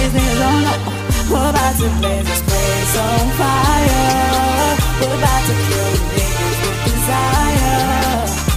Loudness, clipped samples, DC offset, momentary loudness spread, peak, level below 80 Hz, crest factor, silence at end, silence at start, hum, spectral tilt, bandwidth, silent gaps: -15 LUFS; under 0.1%; under 0.1%; 4 LU; 0 dBFS; -22 dBFS; 14 dB; 0 s; 0 s; none; -4.5 dB/octave; 16 kHz; none